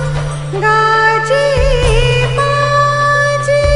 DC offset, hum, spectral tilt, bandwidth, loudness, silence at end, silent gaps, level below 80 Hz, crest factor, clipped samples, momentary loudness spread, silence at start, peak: 2%; none; -5 dB/octave; 11.5 kHz; -12 LUFS; 0 s; none; -22 dBFS; 12 dB; under 0.1%; 5 LU; 0 s; 0 dBFS